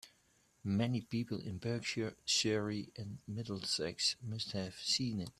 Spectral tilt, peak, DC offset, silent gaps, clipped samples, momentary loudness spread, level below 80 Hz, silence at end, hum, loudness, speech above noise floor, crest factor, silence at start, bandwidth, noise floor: -4 dB/octave; -20 dBFS; under 0.1%; none; under 0.1%; 11 LU; -70 dBFS; 0.1 s; none; -37 LUFS; 34 dB; 18 dB; 0.05 s; 13.5 kHz; -72 dBFS